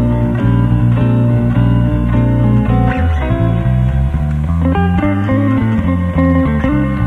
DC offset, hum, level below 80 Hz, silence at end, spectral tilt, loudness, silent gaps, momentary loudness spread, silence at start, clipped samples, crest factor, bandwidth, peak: under 0.1%; none; -20 dBFS; 0 s; -10 dB/octave; -13 LUFS; none; 3 LU; 0 s; under 0.1%; 10 dB; 4 kHz; -2 dBFS